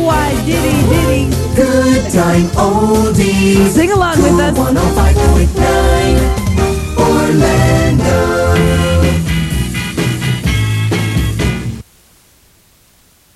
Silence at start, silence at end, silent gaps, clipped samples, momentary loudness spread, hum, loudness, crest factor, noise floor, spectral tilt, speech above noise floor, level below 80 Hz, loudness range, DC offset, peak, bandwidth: 0 s; 1.55 s; none; under 0.1%; 5 LU; none; -12 LUFS; 12 dB; -49 dBFS; -6 dB/octave; 39 dB; -20 dBFS; 5 LU; under 0.1%; 0 dBFS; 14 kHz